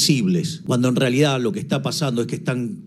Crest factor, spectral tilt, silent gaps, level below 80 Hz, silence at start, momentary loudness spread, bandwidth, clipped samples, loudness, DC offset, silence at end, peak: 16 dB; -5 dB/octave; none; -62 dBFS; 0 s; 6 LU; 15 kHz; under 0.1%; -21 LUFS; under 0.1%; 0 s; -4 dBFS